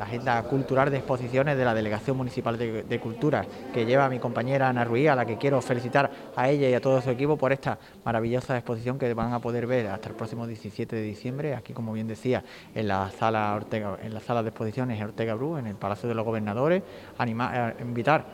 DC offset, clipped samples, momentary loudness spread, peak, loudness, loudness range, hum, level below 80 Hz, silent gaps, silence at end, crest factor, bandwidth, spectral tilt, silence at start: under 0.1%; under 0.1%; 9 LU; -8 dBFS; -27 LUFS; 6 LU; none; -58 dBFS; none; 0 s; 20 dB; 16 kHz; -7.5 dB/octave; 0 s